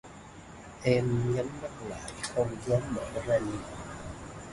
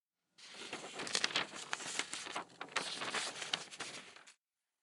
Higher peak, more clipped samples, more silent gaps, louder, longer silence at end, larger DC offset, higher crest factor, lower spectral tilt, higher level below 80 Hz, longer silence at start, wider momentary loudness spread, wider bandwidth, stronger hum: about the same, -12 dBFS vs -12 dBFS; neither; neither; first, -32 LUFS vs -40 LUFS; second, 0 s vs 0.5 s; neither; second, 20 dB vs 30 dB; first, -6 dB/octave vs 0 dB/octave; first, -52 dBFS vs -90 dBFS; second, 0.05 s vs 0.4 s; first, 19 LU vs 15 LU; second, 11.5 kHz vs 16 kHz; neither